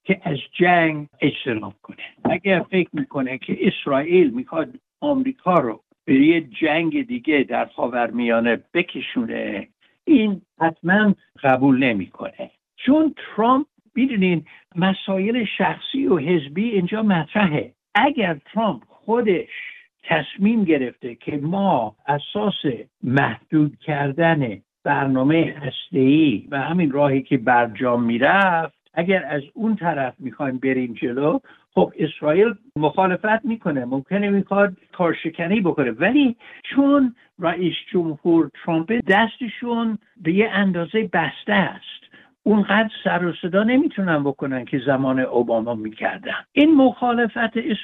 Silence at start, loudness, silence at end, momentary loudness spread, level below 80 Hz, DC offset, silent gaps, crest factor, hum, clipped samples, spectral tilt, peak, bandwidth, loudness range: 0.05 s; -20 LUFS; 0 s; 10 LU; -60 dBFS; under 0.1%; none; 16 dB; none; under 0.1%; -9 dB/octave; -4 dBFS; 4.2 kHz; 3 LU